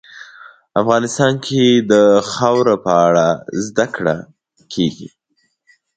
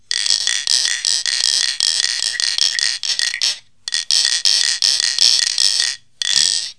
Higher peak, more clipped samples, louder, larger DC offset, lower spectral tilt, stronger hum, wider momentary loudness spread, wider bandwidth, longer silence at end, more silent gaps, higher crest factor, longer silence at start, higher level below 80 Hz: about the same, 0 dBFS vs 0 dBFS; neither; about the same, -15 LUFS vs -14 LUFS; second, under 0.1% vs 0.4%; first, -5 dB/octave vs 4.5 dB/octave; neither; first, 10 LU vs 6 LU; second, 9.2 kHz vs 11 kHz; first, 0.9 s vs 0.05 s; neither; about the same, 16 dB vs 18 dB; about the same, 0.15 s vs 0.1 s; first, -56 dBFS vs -66 dBFS